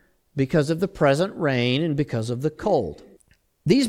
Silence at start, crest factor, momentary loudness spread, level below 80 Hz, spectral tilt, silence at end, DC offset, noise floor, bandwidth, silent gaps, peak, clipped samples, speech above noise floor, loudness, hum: 0.35 s; 18 dB; 7 LU; -50 dBFS; -6.5 dB/octave; 0 s; under 0.1%; -62 dBFS; 15 kHz; none; -4 dBFS; under 0.1%; 39 dB; -23 LUFS; none